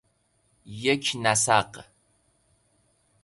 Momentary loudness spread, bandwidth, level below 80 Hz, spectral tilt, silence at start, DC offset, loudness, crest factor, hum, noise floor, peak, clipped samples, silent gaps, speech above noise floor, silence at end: 21 LU; 12 kHz; -62 dBFS; -2.5 dB/octave; 0.65 s; under 0.1%; -23 LUFS; 24 dB; none; -69 dBFS; -6 dBFS; under 0.1%; none; 44 dB; 1.4 s